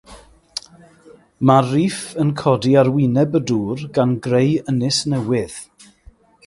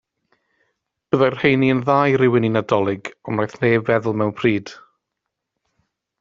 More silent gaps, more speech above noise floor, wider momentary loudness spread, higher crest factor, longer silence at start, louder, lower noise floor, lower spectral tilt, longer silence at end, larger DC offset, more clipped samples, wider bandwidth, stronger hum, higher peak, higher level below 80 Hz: neither; second, 32 dB vs 62 dB; first, 16 LU vs 9 LU; about the same, 18 dB vs 20 dB; second, 0.1 s vs 1.15 s; about the same, -18 LUFS vs -19 LUFS; second, -48 dBFS vs -80 dBFS; about the same, -6 dB/octave vs -5.5 dB/octave; second, 0.8 s vs 1.45 s; neither; neither; first, 11.5 kHz vs 7.6 kHz; neither; about the same, 0 dBFS vs -2 dBFS; first, -52 dBFS vs -58 dBFS